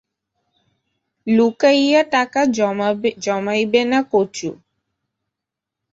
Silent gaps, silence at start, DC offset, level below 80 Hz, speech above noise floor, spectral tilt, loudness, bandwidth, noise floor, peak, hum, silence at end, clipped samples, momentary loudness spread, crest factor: none; 1.25 s; under 0.1%; -64 dBFS; 67 dB; -4.5 dB/octave; -17 LUFS; 8 kHz; -84 dBFS; -2 dBFS; none; 1.4 s; under 0.1%; 9 LU; 18 dB